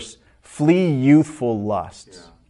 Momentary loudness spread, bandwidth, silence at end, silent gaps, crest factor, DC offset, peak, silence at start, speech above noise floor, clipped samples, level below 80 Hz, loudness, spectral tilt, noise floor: 15 LU; 11 kHz; 0.6 s; none; 16 dB; under 0.1%; -4 dBFS; 0 s; 27 dB; under 0.1%; -56 dBFS; -18 LUFS; -7.5 dB/octave; -45 dBFS